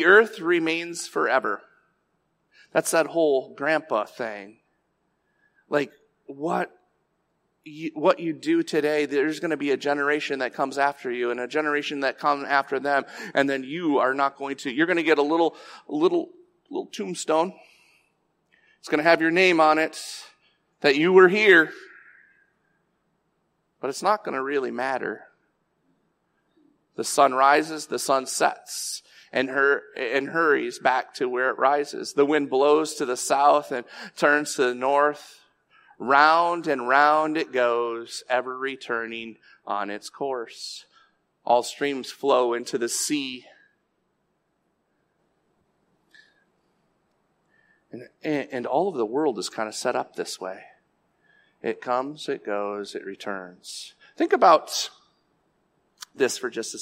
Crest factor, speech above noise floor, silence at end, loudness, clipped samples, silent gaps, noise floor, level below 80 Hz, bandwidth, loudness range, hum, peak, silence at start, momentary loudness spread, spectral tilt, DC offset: 22 dB; 49 dB; 0 s; -23 LUFS; under 0.1%; none; -73 dBFS; -80 dBFS; 16 kHz; 9 LU; none; -4 dBFS; 0 s; 16 LU; -3.5 dB/octave; under 0.1%